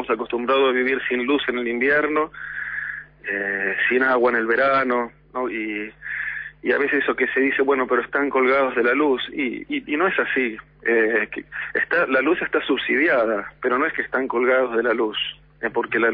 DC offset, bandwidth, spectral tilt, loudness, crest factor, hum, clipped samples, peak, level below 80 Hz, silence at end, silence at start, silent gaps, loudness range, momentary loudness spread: under 0.1%; 5.2 kHz; -7.5 dB/octave; -21 LUFS; 14 dB; none; under 0.1%; -8 dBFS; -56 dBFS; 0 s; 0 s; none; 2 LU; 10 LU